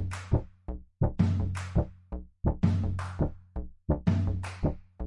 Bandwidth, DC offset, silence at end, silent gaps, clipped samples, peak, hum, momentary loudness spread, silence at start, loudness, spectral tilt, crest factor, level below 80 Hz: 11.5 kHz; under 0.1%; 0 s; none; under 0.1%; -12 dBFS; none; 15 LU; 0 s; -31 LUFS; -8.5 dB/octave; 18 dB; -38 dBFS